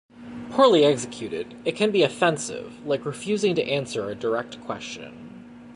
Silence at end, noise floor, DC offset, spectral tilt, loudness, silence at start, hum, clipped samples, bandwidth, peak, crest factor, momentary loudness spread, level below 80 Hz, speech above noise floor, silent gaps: 0 s; -43 dBFS; under 0.1%; -4.5 dB/octave; -24 LUFS; 0.15 s; none; under 0.1%; 11.5 kHz; -6 dBFS; 18 dB; 20 LU; -64 dBFS; 19 dB; none